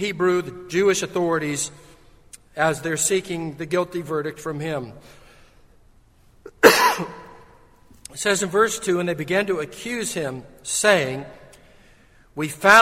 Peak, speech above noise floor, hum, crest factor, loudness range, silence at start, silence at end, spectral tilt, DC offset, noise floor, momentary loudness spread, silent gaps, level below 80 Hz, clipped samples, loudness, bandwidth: 0 dBFS; 32 dB; none; 22 dB; 5 LU; 0 s; 0 s; -3 dB/octave; under 0.1%; -54 dBFS; 14 LU; none; -56 dBFS; under 0.1%; -21 LUFS; 16 kHz